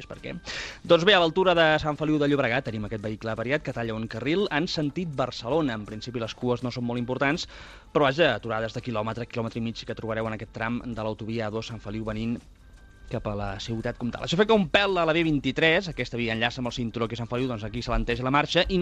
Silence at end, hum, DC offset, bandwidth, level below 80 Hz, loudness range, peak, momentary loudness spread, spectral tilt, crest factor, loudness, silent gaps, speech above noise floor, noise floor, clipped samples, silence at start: 0 s; none; under 0.1%; 10 kHz; -44 dBFS; 9 LU; -6 dBFS; 12 LU; -5.5 dB/octave; 20 dB; -26 LUFS; none; 23 dB; -49 dBFS; under 0.1%; 0 s